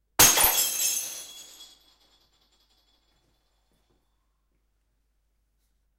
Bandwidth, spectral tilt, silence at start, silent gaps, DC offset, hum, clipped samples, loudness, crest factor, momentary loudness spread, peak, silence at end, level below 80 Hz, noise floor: 16 kHz; 0 dB/octave; 0.2 s; none; under 0.1%; none; under 0.1%; -20 LUFS; 26 dB; 25 LU; -4 dBFS; 4.35 s; -54 dBFS; -72 dBFS